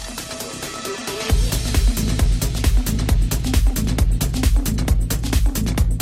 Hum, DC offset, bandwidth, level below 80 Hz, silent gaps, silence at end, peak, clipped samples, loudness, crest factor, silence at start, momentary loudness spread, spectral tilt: none; under 0.1%; 16.5 kHz; -20 dBFS; none; 0 s; -6 dBFS; under 0.1%; -21 LUFS; 12 dB; 0 s; 8 LU; -5 dB/octave